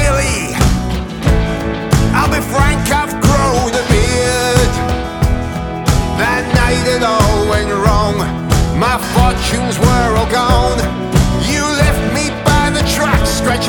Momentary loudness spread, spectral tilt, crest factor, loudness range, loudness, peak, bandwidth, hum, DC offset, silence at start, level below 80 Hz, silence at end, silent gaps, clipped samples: 4 LU; -5 dB/octave; 12 dB; 1 LU; -13 LUFS; 0 dBFS; 20 kHz; none; under 0.1%; 0 s; -20 dBFS; 0 s; none; under 0.1%